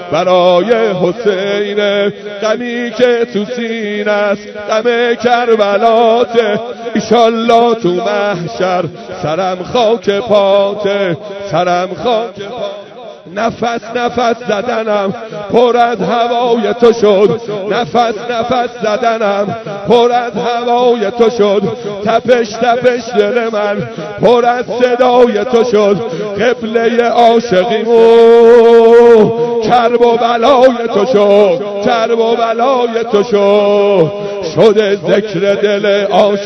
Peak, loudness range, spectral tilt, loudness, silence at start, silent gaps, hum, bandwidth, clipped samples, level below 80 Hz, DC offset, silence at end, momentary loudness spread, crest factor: 0 dBFS; 7 LU; -5.5 dB/octave; -11 LUFS; 0 s; none; none; 6.6 kHz; 1%; -50 dBFS; under 0.1%; 0 s; 9 LU; 10 dB